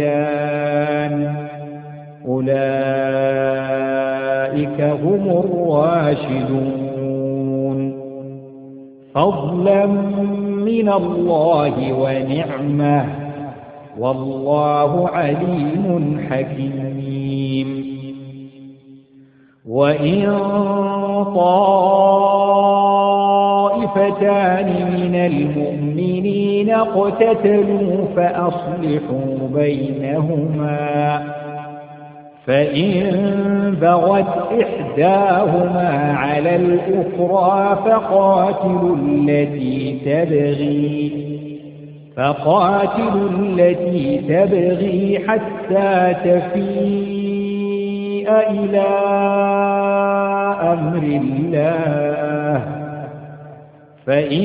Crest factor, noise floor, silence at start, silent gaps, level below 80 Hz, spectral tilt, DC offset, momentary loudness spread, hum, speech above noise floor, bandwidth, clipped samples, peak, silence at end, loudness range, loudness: 16 dB; -48 dBFS; 0 s; none; -52 dBFS; -12.5 dB/octave; under 0.1%; 12 LU; none; 32 dB; 4.9 kHz; under 0.1%; 0 dBFS; 0 s; 5 LU; -17 LUFS